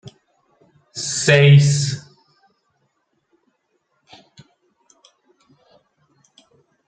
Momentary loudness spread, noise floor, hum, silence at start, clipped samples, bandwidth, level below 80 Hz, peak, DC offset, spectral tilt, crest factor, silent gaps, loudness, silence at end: 20 LU; -69 dBFS; none; 0.95 s; under 0.1%; 9.2 kHz; -60 dBFS; -2 dBFS; under 0.1%; -5 dB/octave; 20 dB; none; -15 LUFS; 4.9 s